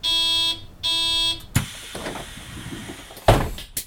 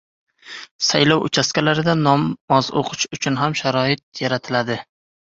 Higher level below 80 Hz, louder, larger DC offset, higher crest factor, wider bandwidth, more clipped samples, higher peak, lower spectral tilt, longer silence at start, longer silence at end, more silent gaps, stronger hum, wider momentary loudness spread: first, -34 dBFS vs -56 dBFS; about the same, -21 LUFS vs -19 LUFS; neither; about the same, 22 dB vs 20 dB; first, 19 kHz vs 7.8 kHz; neither; about the same, -2 dBFS vs 0 dBFS; about the same, -3.5 dB/octave vs -4.5 dB/octave; second, 0 s vs 0.45 s; second, 0 s vs 0.5 s; second, none vs 0.71-0.79 s, 2.41-2.48 s, 4.03-4.12 s; neither; first, 17 LU vs 9 LU